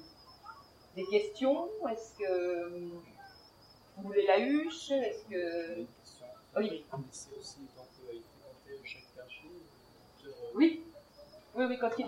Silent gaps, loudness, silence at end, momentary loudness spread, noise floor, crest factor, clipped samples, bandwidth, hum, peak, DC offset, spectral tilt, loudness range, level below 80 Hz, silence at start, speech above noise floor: none; -34 LUFS; 0 s; 25 LU; -60 dBFS; 22 dB; under 0.1%; 15.5 kHz; none; -14 dBFS; under 0.1%; -5 dB/octave; 14 LU; -72 dBFS; 0 s; 27 dB